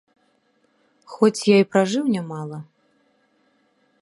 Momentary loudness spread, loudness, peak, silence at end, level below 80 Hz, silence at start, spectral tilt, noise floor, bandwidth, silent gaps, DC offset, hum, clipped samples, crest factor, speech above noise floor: 19 LU; -20 LUFS; -2 dBFS; 1.4 s; -74 dBFS; 1.1 s; -5.5 dB/octave; -65 dBFS; 11.5 kHz; none; under 0.1%; none; under 0.1%; 22 dB; 45 dB